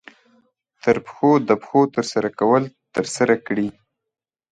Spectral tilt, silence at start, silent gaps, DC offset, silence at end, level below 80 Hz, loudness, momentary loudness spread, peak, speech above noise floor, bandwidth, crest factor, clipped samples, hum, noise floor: -5.5 dB/octave; 0.85 s; none; under 0.1%; 0.8 s; -62 dBFS; -20 LUFS; 8 LU; -2 dBFS; 66 dB; 11 kHz; 20 dB; under 0.1%; none; -85 dBFS